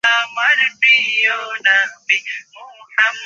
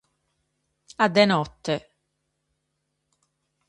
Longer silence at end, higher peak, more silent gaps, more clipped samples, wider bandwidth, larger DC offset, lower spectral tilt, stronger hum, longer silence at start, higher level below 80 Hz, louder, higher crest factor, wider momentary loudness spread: second, 0 s vs 1.9 s; first, 0 dBFS vs -4 dBFS; neither; neither; second, 8.6 kHz vs 11.5 kHz; neither; second, 2 dB/octave vs -5.5 dB/octave; neither; second, 0.05 s vs 1 s; second, -74 dBFS vs -62 dBFS; first, -14 LUFS vs -23 LUFS; second, 16 dB vs 24 dB; second, 8 LU vs 11 LU